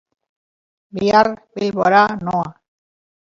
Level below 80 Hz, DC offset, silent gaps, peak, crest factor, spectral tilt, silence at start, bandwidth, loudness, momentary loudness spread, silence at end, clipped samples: -56 dBFS; under 0.1%; none; 0 dBFS; 18 dB; -6 dB/octave; 0.95 s; 7.6 kHz; -17 LUFS; 12 LU; 0.75 s; under 0.1%